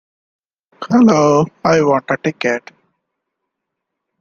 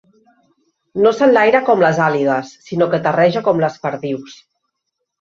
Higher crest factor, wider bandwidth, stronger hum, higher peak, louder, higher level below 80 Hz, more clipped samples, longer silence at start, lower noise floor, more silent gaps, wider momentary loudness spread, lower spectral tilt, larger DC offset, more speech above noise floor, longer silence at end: about the same, 16 dB vs 16 dB; about the same, 7.2 kHz vs 7.4 kHz; neither; about the same, -2 dBFS vs -2 dBFS; about the same, -14 LUFS vs -15 LUFS; about the same, -56 dBFS vs -60 dBFS; neither; second, 0.8 s vs 0.95 s; about the same, -78 dBFS vs -76 dBFS; neither; second, 9 LU vs 13 LU; about the same, -6 dB/octave vs -6.5 dB/octave; neither; first, 65 dB vs 61 dB; first, 1.6 s vs 0.85 s